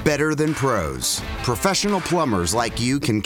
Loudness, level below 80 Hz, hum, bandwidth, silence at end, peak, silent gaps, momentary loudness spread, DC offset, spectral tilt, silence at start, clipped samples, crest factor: -21 LUFS; -38 dBFS; none; over 20 kHz; 0 s; -4 dBFS; none; 3 LU; under 0.1%; -4 dB/octave; 0 s; under 0.1%; 18 dB